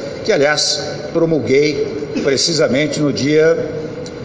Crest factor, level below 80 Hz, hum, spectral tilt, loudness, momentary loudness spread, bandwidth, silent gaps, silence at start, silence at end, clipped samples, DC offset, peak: 14 dB; -48 dBFS; none; -4 dB/octave; -15 LUFS; 8 LU; 8 kHz; none; 0 s; 0 s; under 0.1%; under 0.1%; -2 dBFS